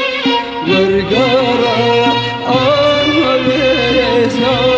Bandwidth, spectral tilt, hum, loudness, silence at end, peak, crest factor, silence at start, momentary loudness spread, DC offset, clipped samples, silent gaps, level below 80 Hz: 8.2 kHz; -5.5 dB/octave; none; -12 LUFS; 0 s; 0 dBFS; 12 dB; 0 s; 3 LU; under 0.1%; under 0.1%; none; -38 dBFS